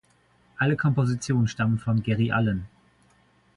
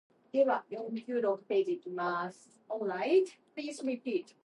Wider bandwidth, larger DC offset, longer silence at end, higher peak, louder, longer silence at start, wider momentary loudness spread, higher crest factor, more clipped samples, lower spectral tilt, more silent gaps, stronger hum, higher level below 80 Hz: about the same, 11 kHz vs 11 kHz; neither; first, 0.9 s vs 0.2 s; first, -10 dBFS vs -16 dBFS; first, -25 LUFS vs -33 LUFS; first, 0.6 s vs 0.35 s; second, 4 LU vs 11 LU; about the same, 16 dB vs 16 dB; neither; first, -7 dB/octave vs -5.5 dB/octave; neither; neither; first, -52 dBFS vs under -90 dBFS